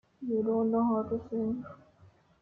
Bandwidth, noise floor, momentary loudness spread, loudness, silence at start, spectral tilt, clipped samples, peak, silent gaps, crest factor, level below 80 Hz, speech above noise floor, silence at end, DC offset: 2.3 kHz; -61 dBFS; 9 LU; -31 LUFS; 0.2 s; -11.5 dB/octave; under 0.1%; -18 dBFS; none; 14 dB; -66 dBFS; 31 dB; 0.65 s; under 0.1%